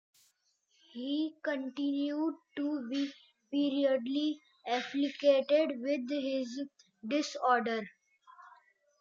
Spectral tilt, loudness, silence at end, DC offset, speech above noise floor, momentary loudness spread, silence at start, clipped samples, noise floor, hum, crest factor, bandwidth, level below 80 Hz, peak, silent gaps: -4 dB/octave; -33 LUFS; 0.5 s; under 0.1%; 42 dB; 11 LU; 0.95 s; under 0.1%; -75 dBFS; none; 20 dB; 7.6 kHz; under -90 dBFS; -14 dBFS; none